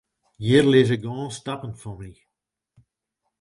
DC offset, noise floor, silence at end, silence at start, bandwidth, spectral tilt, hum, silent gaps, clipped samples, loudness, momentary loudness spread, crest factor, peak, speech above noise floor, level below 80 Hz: under 0.1%; -80 dBFS; 1.3 s; 0.4 s; 11.5 kHz; -6.5 dB/octave; none; none; under 0.1%; -21 LUFS; 22 LU; 20 dB; -4 dBFS; 58 dB; -54 dBFS